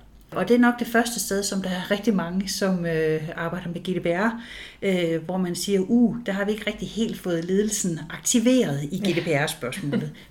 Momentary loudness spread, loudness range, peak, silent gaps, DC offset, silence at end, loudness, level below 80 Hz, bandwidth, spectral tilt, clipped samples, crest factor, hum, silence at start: 9 LU; 2 LU; -8 dBFS; none; under 0.1%; 0.05 s; -24 LUFS; -52 dBFS; 18 kHz; -4.5 dB/octave; under 0.1%; 16 dB; none; 0.3 s